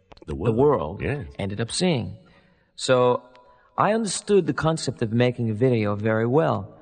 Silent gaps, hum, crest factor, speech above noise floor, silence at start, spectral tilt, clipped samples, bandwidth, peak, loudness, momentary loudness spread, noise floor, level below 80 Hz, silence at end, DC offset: none; none; 18 dB; 35 dB; 0.25 s; -5.5 dB/octave; under 0.1%; 9.4 kHz; -4 dBFS; -23 LUFS; 9 LU; -57 dBFS; -48 dBFS; 0.1 s; under 0.1%